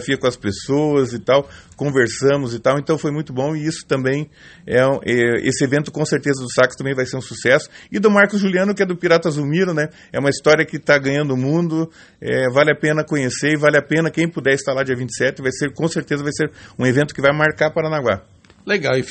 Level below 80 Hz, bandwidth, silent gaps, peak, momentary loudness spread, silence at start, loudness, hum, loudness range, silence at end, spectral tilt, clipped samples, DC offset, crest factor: -54 dBFS; 8.8 kHz; none; 0 dBFS; 7 LU; 0 s; -18 LUFS; none; 2 LU; 0 s; -5.5 dB/octave; under 0.1%; under 0.1%; 18 dB